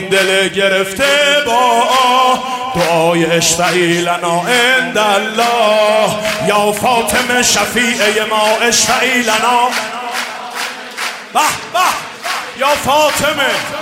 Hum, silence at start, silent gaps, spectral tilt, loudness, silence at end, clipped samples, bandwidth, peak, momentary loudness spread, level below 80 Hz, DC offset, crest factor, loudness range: none; 0 s; none; -2 dB/octave; -12 LUFS; 0 s; under 0.1%; 16 kHz; 0 dBFS; 9 LU; -48 dBFS; under 0.1%; 12 dB; 4 LU